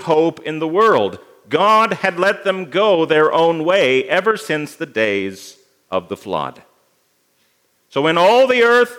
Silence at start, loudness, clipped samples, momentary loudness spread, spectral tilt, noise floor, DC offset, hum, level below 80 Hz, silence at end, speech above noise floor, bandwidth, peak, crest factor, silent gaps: 0 s; -16 LUFS; under 0.1%; 12 LU; -5 dB/octave; -62 dBFS; under 0.1%; none; -70 dBFS; 0 s; 46 dB; 16 kHz; 0 dBFS; 16 dB; none